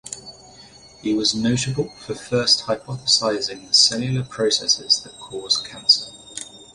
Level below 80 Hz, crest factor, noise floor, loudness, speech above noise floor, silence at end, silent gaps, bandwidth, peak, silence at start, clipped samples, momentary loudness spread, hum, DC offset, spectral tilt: -54 dBFS; 20 dB; -46 dBFS; -19 LUFS; 25 dB; 0.1 s; none; 11.5 kHz; -2 dBFS; 0.05 s; under 0.1%; 17 LU; none; under 0.1%; -3 dB/octave